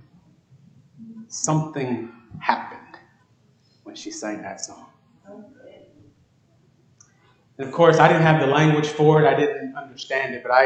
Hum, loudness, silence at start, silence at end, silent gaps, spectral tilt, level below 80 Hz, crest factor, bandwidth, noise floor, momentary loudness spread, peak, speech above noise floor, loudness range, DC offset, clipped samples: none; -20 LUFS; 1 s; 0 s; none; -5.5 dB/octave; -66 dBFS; 22 dB; 9 kHz; -60 dBFS; 20 LU; 0 dBFS; 40 dB; 19 LU; under 0.1%; under 0.1%